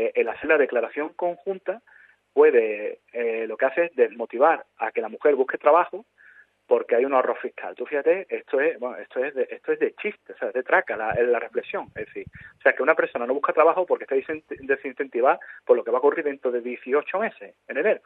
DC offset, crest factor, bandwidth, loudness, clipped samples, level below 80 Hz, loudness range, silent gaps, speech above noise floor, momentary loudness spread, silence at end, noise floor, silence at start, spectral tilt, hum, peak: under 0.1%; 22 dB; 4 kHz; -24 LUFS; under 0.1%; -68 dBFS; 3 LU; none; 30 dB; 12 LU; 0.1 s; -54 dBFS; 0 s; -8 dB/octave; none; -2 dBFS